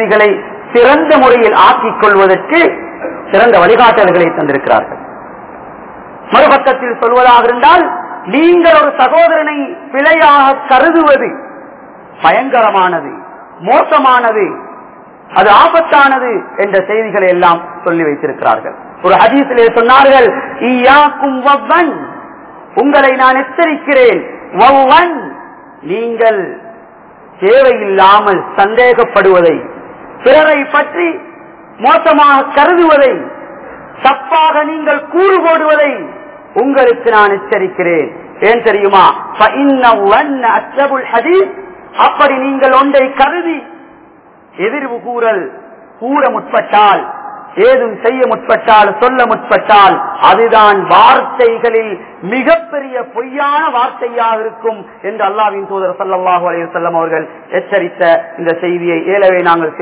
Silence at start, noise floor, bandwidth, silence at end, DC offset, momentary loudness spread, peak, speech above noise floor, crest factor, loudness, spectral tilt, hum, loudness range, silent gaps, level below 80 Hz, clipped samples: 0 s; -40 dBFS; 4 kHz; 0 s; under 0.1%; 13 LU; 0 dBFS; 32 dB; 10 dB; -9 LUFS; -8 dB/octave; none; 6 LU; none; -48 dBFS; 4%